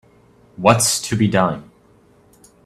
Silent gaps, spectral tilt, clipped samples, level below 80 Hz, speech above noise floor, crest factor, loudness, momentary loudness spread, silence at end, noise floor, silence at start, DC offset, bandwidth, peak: none; -4 dB/octave; under 0.1%; -52 dBFS; 36 dB; 20 dB; -17 LUFS; 7 LU; 1.05 s; -52 dBFS; 0.6 s; under 0.1%; 15.5 kHz; 0 dBFS